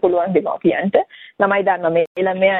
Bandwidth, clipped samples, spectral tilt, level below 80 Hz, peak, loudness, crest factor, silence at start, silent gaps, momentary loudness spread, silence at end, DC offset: 4.1 kHz; under 0.1%; -9 dB/octave; -58 dBFS; -2 dBFS; -18 LUFS; 16 dB; 0.05 s; 2.07-2.15 s; 4 LU; 0 s; under 0.1%